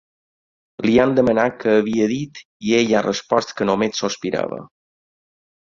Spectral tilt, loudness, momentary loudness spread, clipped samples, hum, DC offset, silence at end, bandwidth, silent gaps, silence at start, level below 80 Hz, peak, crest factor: -5 dB/octave; -19 LUFS; 11 LU; under 0.1%; none; under 0.1%; 1 s; 7.6 kHz; 2.45-2.60 s; 0.8 s; -54 dBFS; -2 dBFS; 18 dB